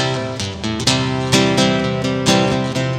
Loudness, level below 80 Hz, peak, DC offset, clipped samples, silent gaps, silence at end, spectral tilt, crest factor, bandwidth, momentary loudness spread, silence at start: -17 LUFS; -42 dBFS; 0 dBFS; under 0.1%; under 0.1%; none; 0 s; -4.5 dB/octave; 16 dB; 15.5 kHz; 8 LU; 0 s